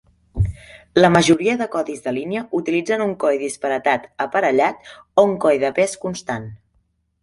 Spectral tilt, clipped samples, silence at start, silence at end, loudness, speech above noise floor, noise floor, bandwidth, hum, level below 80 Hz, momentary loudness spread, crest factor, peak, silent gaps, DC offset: -5.5 dB/octave; under 0.1%; 0.35 s; 0.65 s; -19 LUFS; 46 dB; -65 dBFS; 11.5 kHz; none; -40 dBFS; 12 LU; 18 dB; -2 dBFS; none; under 0.1%